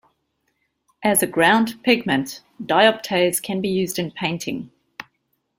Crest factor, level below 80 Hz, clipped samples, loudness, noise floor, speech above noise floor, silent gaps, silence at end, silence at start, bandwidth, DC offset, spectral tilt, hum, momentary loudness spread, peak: 20 dB; -60 dBFS; under 0.1%; -20 LUFS; -71 dBFS; 51 dB; none; 0.55 s; 1 s; 16.5 kHz; under 0.1%; -3.5 dB/octave; none; 18 LU; -2 dBFS